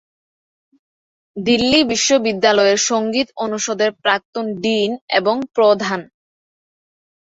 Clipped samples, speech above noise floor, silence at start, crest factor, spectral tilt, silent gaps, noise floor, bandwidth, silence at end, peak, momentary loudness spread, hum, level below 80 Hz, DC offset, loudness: under 0.1%; over 73 dB; 1.35 s; 16 dB; -2.5 dB/octave; 4.25-4.33 s, 5.01-5.08 s; under -90 dBFS; 8 kHz; 1.25 s; -2 dBFS; 8 LU; none; -54 dBFS; under 0.1%; -17 LUFS